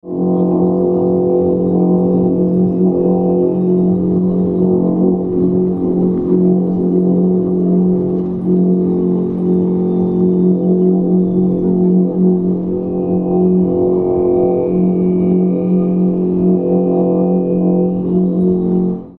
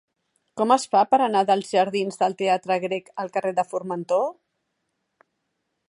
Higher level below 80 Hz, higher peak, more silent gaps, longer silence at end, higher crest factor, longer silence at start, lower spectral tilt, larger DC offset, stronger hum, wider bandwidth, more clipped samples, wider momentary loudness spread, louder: first, -42 dBFS vs -76 dBFS; about the same, -2 dBFS vs -4 dBFS; neither; second, 0.05 s vs 1.6 s; second, 12 dB vs 20 dB; second, 0.05 s vs 0.55 s; first, -14 dB/octave vs -4.5 dB/octave; neither; neither; second, 2.5 kHz vs 11.5 kHz; neither; second, 2 LU vs 10 LU; first, -14 LUFS vs -23 LUFS